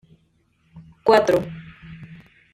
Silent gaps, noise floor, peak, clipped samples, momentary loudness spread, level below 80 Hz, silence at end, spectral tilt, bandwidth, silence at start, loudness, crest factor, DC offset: none; -64 dBFS; -2 dBFS; under 0.1%; 25 LU; -54 dBFS; 0.4 s; -5.5 dB/octave; 16 kHz; 0.75 s; -19 LUFS; 20 dB; under 0.1%